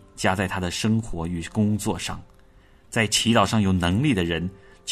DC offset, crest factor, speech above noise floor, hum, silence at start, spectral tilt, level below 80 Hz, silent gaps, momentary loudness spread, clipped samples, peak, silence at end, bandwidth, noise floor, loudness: under 0.1%; 18 dB; 30 dB; none; 0.15 s; -4.5 dB/octave; -46 dBFS; none; 11 LU; under 0.1%; -6 dBFS; 0 s; 13.5 kHz; -53 dBFS; -23 LUFS